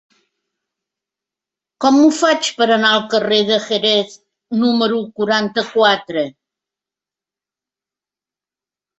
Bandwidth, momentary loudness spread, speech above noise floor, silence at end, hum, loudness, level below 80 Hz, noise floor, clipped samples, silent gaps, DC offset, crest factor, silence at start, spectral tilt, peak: 8.4 kHz; 9 LU; 75 dB; 2.7 s; 50 Hz at -75 dBFS; -15 LUFS; -64 dBFS; -90 dBFS; under 0.1%; none; under 0.1%; 18 dB; 1.8 s; -3.5 dB/octave; -2 dBFS